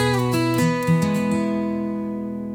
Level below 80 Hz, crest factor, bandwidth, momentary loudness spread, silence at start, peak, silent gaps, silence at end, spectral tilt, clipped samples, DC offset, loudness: -52 dBFS; 12 dB; 18.5 kHz; 7 LU; 0 s; -8 dBFS; none; 0 s; -6.5 dB/octave; under 0.1%; under 0.1%; -22 LUFS